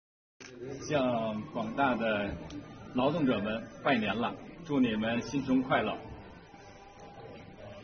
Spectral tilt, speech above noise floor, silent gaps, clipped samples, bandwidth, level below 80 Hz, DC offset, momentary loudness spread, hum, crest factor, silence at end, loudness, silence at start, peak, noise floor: -4.5 dB/octave; 21 dB; none; under 0.1%; 6.6 kHz; -58 dBFS; under 0.1%; 22 LU; none; 18 dB; 0 s; -31 LUFS; 0.4 s; -16 dBFS; -52 dBFS